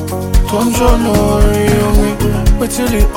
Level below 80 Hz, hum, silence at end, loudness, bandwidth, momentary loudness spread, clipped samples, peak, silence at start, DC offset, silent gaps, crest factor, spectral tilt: -14 dBFS; none; 0 s; -13 LUFS; 17 kHz; 3 LU; under 0.1%; 0 dBFS; 0 s; under 0.1%; none; 10 dB; -6 dB/octave